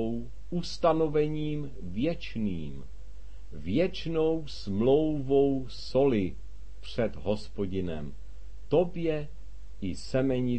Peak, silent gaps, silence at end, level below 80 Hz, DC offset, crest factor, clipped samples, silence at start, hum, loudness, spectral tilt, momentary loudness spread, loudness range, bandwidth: -12 dBFS; none; 0 s; -46 dBFS; 2%; 18 dB; under 0.1%; 0 s; none; -30 LUFS; -7.5 dB/octave; 23 LU; 5 LU; 8.8 kHz